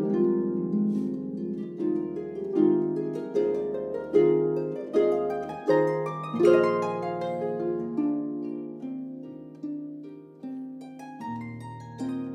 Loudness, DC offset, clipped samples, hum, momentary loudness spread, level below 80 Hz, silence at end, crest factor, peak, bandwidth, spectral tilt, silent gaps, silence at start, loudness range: -27 LUFS; under 0.1%; under 0.1%; none; 16 LU; -68 dBFS; 0 s; 20 dB; -8 dBFS; 9 kHz; -8.5 dB/octave; none; 0 s; 13 LU